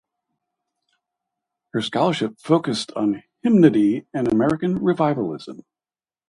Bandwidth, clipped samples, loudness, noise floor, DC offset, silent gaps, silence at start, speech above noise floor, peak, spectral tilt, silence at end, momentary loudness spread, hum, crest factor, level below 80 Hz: 11.5 kHz; under 0.1%; -20 LUFS; under -90 dBFS; under 0.1%; none; 1.75 s; over 70 dB; -2 dBFS; -6.5 dB/octave; 0.75 s; 12 LU; none; 20 dB; -58 dBFS